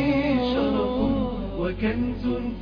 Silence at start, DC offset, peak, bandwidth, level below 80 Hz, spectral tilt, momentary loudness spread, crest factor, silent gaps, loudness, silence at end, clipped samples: 0 s; under 0.1%; -12 dBFS; 5.2 kHz; -36 dBFS; -8.5 dB/octave; 6 LU; 12 dB; none; -25 LUFS; 0 s; under 0.1%